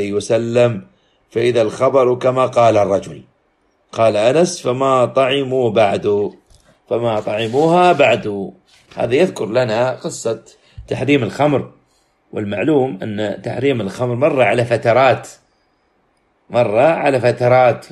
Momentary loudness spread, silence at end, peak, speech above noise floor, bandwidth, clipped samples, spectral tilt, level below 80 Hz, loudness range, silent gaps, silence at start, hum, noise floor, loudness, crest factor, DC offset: 11 LU; 0.05 s; -2 dBFS; 46 dB; 12 kHz; under 0.1%; -6 dB/octave; -54 dBFS; 4 LU; none; 0 s; none; -61 dBFS; -16 LUFS; 16 dB; under 0.1%